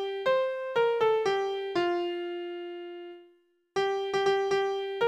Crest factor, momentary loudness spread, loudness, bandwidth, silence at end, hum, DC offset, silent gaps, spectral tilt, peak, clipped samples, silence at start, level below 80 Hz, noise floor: 16 dB; 14 LU; -29 LUFS; 9.4 kHz; 0 s; none; under 0.1%; none; -4 dB/octave; -14 dBFS; under 0.1%; 0 s; -72 dBFS; -64 dBFS